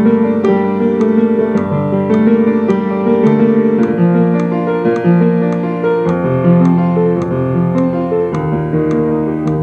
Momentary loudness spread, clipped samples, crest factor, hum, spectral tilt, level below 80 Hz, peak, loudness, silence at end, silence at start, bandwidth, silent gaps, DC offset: 5 LU; under 0.1%; 12 dB; none; -10 dB/octave; -44 dBFS; 0 dBFS; -13 LUFS; 0 s; 0 s; 6.6 kHz; none; under 0.1%